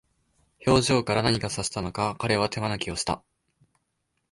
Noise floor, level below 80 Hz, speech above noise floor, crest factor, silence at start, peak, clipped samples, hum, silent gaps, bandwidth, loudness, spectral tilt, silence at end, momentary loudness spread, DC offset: -77 dBFS; -48 dBFS; 51 dB; 20 dB; 0.6 s; -6 dBFS; under 0.1%; none; none; 11.5 kHz; -26 LUFS; -4.5 dB/octave; 1.15 s; 8 LU; under 0.1%